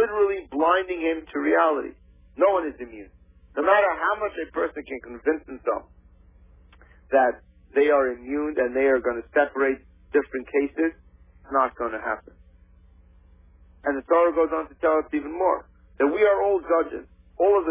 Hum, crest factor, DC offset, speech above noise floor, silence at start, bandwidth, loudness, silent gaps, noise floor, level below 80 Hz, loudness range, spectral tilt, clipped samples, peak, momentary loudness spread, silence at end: none; 18 dB; under 0.1%; 30 dB; 0 s; 3.8 kHz; -24 LUFS; none; -53 dBFS; -54 dBFS; 5 LU; -8.5 dB/octave; under 0.1%; -6 dBFS; 11 LU; 0 s